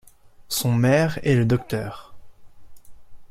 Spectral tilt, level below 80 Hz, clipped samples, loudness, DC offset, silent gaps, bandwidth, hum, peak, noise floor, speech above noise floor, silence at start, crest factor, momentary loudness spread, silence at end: -6 dB/octave; -50 dBFS; under 0.1%; -21 LUFS; under 0.1%; none; 16 kHz; none; -4 dBFS; -44 dBFS; 23 dB; 0.5 s; 18 dB; 13 LU; 0.05 s